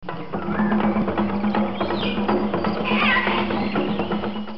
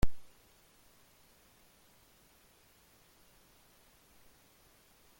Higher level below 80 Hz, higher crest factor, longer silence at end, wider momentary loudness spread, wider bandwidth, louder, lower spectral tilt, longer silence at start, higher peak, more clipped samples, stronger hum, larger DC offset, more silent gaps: about the same, -46 dBFS vs -48 dBFS; second, 14 dB vs 24 dB; second, 0 s vs 5 s; first, 7 LU vs 0 LU; second, 5.8 kHz vs 17 kHz; first, -22 LUFS vs -57 LUFS; first, -8.5 dB/octave vs -5.5 dB/octave; about the same, 0 s vs 0.05 s; first, -8 dBFS vs -14 dBFS; neither; neither; first, 2% vs under 0.1%; neither